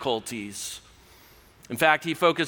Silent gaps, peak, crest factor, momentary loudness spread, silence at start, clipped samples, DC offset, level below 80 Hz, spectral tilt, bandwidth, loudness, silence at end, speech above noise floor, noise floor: none; -4 dBFS; 22 dB; 15 LU; 0 s; under 0.1%; under 0.1%; -62 dBFS; -3.5 dB/octave; over 20 kHz; -25 LUFS; 0 s; 29 dB; -54 dBFS